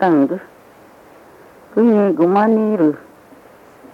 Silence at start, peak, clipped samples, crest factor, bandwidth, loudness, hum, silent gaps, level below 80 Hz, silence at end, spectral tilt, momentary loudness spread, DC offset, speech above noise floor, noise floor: 0 s; -4 dBFS; under 0.1%; 14 dB; 5.8 kHz; -15 LUFS; none; none; -66 dBFS; 0.95 s; -9 dB/octave; 10 LU; under 0.1%; 31 dB; -45 dBFS